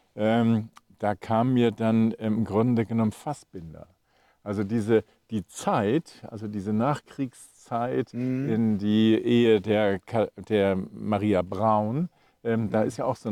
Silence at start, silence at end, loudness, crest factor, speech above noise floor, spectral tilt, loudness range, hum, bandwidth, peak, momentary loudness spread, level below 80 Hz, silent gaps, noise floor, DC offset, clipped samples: 0.15 s; 0 s; -26 LUFS; 16 dB; 40 dB; -7.5 dB/octave; 5 LU; none; 12 kHz; -10 dBFS; 13 LU; -66 dBFS; none; -65 dBFS; under 0.1%; under 0.1%